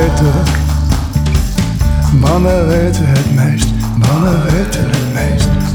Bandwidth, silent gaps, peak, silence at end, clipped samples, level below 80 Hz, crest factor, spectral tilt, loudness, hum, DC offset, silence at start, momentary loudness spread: 20 kHz; none; -2 dBFS; 0 s; under 0.1%; -18 dBFS; 10 dB; -6.5 dB/octave; -12 LUFS; none; under 0.1%; 0 s; 4 LU